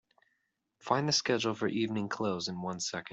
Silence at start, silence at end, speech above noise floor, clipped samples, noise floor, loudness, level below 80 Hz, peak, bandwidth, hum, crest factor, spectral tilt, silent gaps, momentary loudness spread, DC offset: 0.85 s; 0 s; 48 dB; under 0.1%; -80 dBFS; -32 LUFS; -74 dBFS; -12 dBFS; 8.2 kHz; none; 22 dB; -4 dB/octave; none; 8 LU; under 0.1%